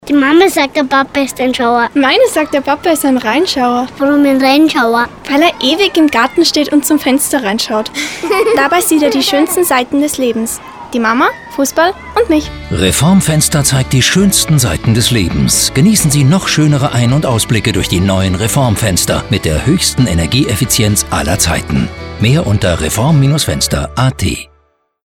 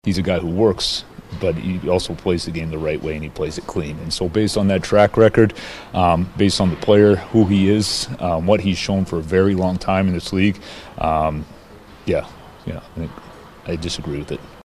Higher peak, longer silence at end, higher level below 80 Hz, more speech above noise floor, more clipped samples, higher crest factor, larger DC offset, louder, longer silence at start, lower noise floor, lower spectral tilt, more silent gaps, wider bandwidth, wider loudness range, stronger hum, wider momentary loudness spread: about the same, 0 dBFS vs 0 dBFS; first, 0.65 s vs 0.05 s; first, -30 dBFS vs -38 dBFS; first, 44 dB vs 24 dB; neither; second, 12 dB vs 18 dB; neither; first, -11 LUFS vs -19 LUFS; about the same, 0.05 s vs 0.05 s; first, -55 dBFS vs -42 dBFS; second, -4.5 dB/octave vs -6 dB/octave; neither; first, 19.5 kHz vs 13 kHz; second, 3 LU vs 9 LU; neither; second, 6 LU vs 17 LU